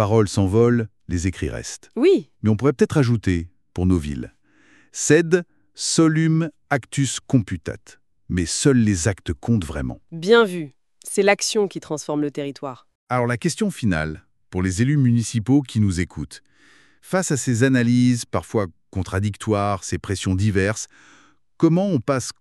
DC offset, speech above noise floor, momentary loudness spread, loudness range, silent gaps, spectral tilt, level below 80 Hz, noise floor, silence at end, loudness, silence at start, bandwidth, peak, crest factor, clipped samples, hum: under 0.1%; 36 dB; 14 LU; 3 LU; 12.95-13.07 s; -5.5 dB/octave; -44 dBFS; -56 dBFS; 0.1 s; -21 LUFS; 0 s; 12.5 kHz; -2 dBFS; 20 dB; under 0.1%; none